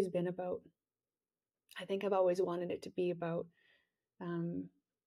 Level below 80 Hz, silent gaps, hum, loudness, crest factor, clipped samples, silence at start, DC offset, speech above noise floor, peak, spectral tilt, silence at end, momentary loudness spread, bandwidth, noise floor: -82 dBFS; none; none; -38 LUFS; 18 dB; under 0.1%; 0 s; under 0.1%; over 52 dB; -20 dBFS; -7.5 dB/octave; 0.4 s; 16 LU; 13.5 kHz; under -90 dBFS